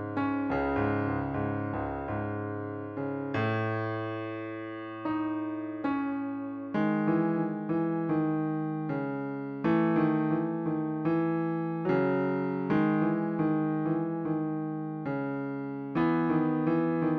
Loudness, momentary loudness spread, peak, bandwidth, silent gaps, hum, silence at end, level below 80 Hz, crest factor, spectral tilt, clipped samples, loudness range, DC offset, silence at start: -30 LUFS; 8 LU; -14 dBFS; 4.9 kHz; none; none; 0 s; -58 dBFS; 16 dB; -10.5 dB/octave; under 0.1%; 5 LU; under 0.1%; 0 s